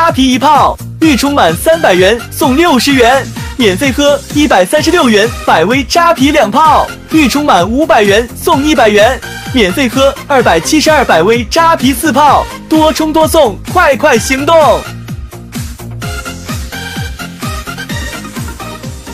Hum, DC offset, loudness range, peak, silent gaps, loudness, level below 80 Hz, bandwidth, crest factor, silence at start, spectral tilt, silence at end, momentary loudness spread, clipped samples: none; under 0.1%; 6 LU; 0 dBFS; none; -8 LUFS; -28 dBFS; 16.5 kHz; 10 dB; 0 s; -4 dB/octave; 0 s; 14 LU; 1%